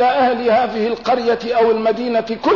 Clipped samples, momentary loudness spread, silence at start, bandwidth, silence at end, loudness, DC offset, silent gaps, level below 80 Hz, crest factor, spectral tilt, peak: under 0.1%; 5 LU; 0 s; 6 kHz; 0 s; -17 LUFS; 0.2%; none; -54 dBFS; 10 dB; -5.5 dB/octave; -6 dBFS